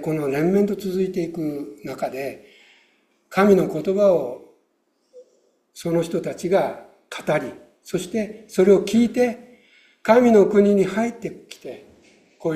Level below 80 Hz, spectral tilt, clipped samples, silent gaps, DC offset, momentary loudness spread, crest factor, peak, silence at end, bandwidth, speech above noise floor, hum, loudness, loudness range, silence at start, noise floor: -60 dBFS; -6.5 dB/octave; under 0.1%; none; under 0.1%; 19 LU; 20 dB; -2 dBFS; 0 s; 14.5 kHz; 48 dB; none; -20 LUFS; 8 LU; 0 s; -68 dBFS